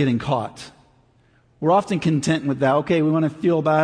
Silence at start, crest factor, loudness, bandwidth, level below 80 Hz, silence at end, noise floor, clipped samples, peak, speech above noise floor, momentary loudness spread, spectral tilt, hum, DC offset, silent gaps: 0 s; 14 dB; -20 LUFS; 10.5 kHz; -56 dBFS; 0 s; -58 dBFS; under 0.1%; -6 dBFS; 38 dB; 9 LU; -6.5 dB/octave; none; under 0.1%; none